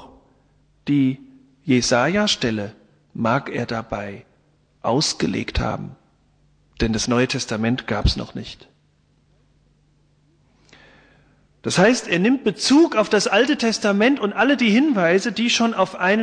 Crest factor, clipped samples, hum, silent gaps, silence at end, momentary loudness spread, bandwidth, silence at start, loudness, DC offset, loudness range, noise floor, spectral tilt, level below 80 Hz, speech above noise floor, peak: 16 dB; under 0.1%; none; none; 0 s; 15 LU; 10 kHz; 0 s; -19 LUFS; under 0.1%; 9 LU; -61 dBFS; -4.5 dB/octave; -38 dBFS; 41 dB; -4 dBFS